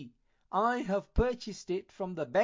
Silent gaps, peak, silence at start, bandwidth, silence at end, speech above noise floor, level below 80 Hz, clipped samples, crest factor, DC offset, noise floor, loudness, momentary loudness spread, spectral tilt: none; -14 dBFS; 0 s; 7.6 kHz; 0 s; 22 dB; -42 dBFS; under 0.1%; 18 dB; under 0.1%; -53 dBFS; -33 LUFS; 10 LU; -6 dB/octave